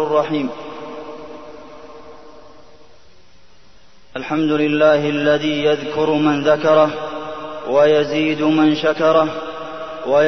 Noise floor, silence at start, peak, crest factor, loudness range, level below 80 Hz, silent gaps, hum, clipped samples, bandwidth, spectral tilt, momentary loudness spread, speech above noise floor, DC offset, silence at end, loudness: -51 dBFS; 0 s; -2 dBFS; 16 dB; 15 LU; -54 dBFS; none; none; under 0.1%; 6.4 kHz; -6 dB/octave; 19 LU; 35 dB; 0.9%; 0 s; -17 LUFS